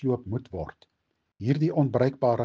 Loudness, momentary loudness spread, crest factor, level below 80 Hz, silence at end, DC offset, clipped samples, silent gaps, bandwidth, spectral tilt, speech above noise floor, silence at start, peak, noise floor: -27 LUFS; 13 LU; 18 dB; -56 dBFS; 0 s; under 0.1%; under 0.1%; none; 6.8 kHz; -9.5 dB/octave; 51 dB; 0 s; -8 dBFS; -77 dBFS